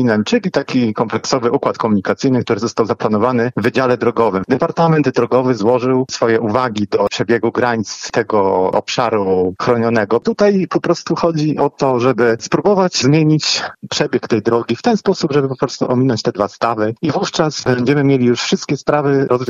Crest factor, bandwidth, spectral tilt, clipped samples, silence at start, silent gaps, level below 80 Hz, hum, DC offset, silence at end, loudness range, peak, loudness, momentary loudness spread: 14 dB; 7.8 kHz; -5.5 dB/octave; under 0.1%; 0 s; none; -54 dBFS; none; under 0.1%; 0 s; 2 LU; 0 dBFS; -15 LUFS; 4 LU